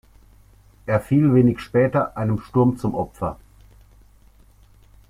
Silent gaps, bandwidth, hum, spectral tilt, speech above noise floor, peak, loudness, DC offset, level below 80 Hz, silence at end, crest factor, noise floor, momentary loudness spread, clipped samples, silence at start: none; 14.5 kHz; 50 Hz at -50 dBFS; -9.5 dB/octave; 32 dB; -6 dBFS; -20 LUFS; under 0.1%; -48 dBFS; 1.75 s; 18 dB; -52 dBFS; 13 LU; under 0.1%; 0.85 s